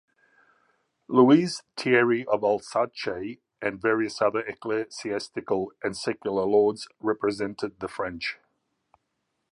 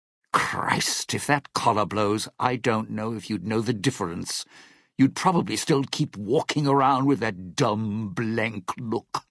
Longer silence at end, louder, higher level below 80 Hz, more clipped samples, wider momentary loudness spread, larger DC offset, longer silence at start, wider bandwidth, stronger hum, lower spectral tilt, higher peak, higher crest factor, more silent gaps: first, 1.2 s vs 0.1 s; about the same, -26 LUFS vs -25 LUFS; about the same, -64 dBFS vs -62 dBFS; neither; about the same, 11 LU vs 9 LU; neither; first, 1.1 s vs 0.35 s; about the same, 11 kHz vs 11 kHz; neither; about the same, -5.5 dB/octave vs -4.5 dB/octave; about the same, -4 dBFS vs -4 dBFS; about the same, 22 dB vs 22 dB; neither